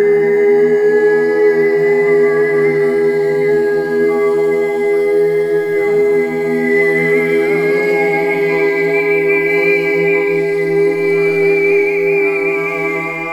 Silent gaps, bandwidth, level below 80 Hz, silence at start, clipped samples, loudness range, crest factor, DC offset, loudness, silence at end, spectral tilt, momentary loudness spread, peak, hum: none; 13.5 kHz; -60 dBFS; 0 s; under 0.1%; 2 LU; 10 dB; under 0.1%; -13 LUFS; 0 s; -6.5 dB/octave; 3 LU; -2 dBFS; none